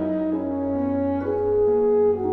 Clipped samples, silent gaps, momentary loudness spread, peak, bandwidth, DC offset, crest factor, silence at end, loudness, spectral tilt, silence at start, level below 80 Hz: under 0.1%; none; 6 LU; -12 dBFS; 3.5 kHz; under 0.1%; 10 dB; 0 s; -22 LUFS; -11 dB/octave; 0 s; -50 dBFS